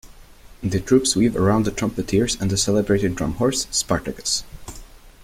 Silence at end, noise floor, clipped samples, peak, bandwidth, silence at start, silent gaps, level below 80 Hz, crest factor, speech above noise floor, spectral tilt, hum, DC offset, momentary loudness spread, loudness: 0.15 s; -44 dBFS; under 0.1%; -4 dBFS; 16.5 kHz; 0.05 s; none; -40 dBFS; 18 dB; 24 dB; -4.5 dB/octave; none; under 0.1%; 8 LU; -21 LUFS